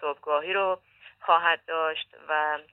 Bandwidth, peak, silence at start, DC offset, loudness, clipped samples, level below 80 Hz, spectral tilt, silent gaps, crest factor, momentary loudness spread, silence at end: 4.2 kHz; -8 dBFS; 0 s; under 0.1%; -27 LUFS; under 0.1%; -76 dBFS; -5 dB/octave; none; 20 dB; 12 LU; 0.1 s